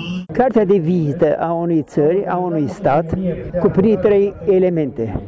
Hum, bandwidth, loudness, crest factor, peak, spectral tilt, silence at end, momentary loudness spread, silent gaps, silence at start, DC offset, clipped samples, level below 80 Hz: none; 7.8 kHz; -17 LUFS; 10 dB; -6 dBFS; -9 dB/octave; 0 s; 6 LU; none; 0 s; under 0.1%; under 0.1%; -40 dBFS